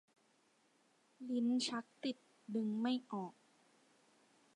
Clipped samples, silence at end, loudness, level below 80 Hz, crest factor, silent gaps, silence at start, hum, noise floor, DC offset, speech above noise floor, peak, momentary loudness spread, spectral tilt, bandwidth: under 0.1%; 1.25 s; -40 LUFS; under -90 dBFS; 16 dB; none; 1.2 s; none; -75 dBFS; under 0.1%; 35 dB; -26 dBFS; 13 LU; -4.5 dB/octave; 11 kHz